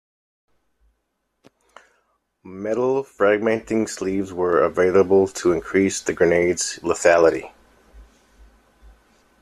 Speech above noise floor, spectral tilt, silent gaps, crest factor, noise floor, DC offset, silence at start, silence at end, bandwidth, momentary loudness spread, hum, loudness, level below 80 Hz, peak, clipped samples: 55 dB; -4.5 dB/octave; none; 18 dB; -74 dBFS; under 0.1%; 2.45 s; 1.4 s; 13 kHz; 9 LU; none; -20 LUFS; -54 dBFS; -2 dBFS; under 0.1%